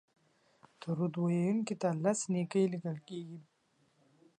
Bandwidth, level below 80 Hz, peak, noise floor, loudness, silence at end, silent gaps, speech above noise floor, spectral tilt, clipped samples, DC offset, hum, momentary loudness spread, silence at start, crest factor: 10 kHz; -82 dBFS; -16 dBFS; -73 dBFS; -34 LUFS; 0.95 s; none; 40 dB; -6.5 dB/octave; under 0.1%; under 0.1%; none; 14 LU; 0.8 s; 18 dB